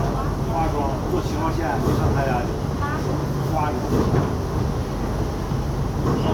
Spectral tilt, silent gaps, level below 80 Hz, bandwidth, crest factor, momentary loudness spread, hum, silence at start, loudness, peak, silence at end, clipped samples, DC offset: -7 dB/octave; none; -30 dBFS; 17.5 kHz; 16 dB; 5 LU; none; 0 s; -23 LUFS; -6 dBFS; 0 s; under 0.1%; under 0.1%